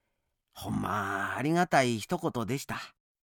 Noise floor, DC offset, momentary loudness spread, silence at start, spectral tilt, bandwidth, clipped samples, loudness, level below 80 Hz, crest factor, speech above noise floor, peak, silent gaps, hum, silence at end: -81 dBFS; under 0.1%; 13 LU; 0.55 s; -5 dB/octave; 19 kHz; under 0.1%; -30 LUFS; -60 dBFS; 22 dB; 51 dB; -10 dBFS; none; none; 0.35 s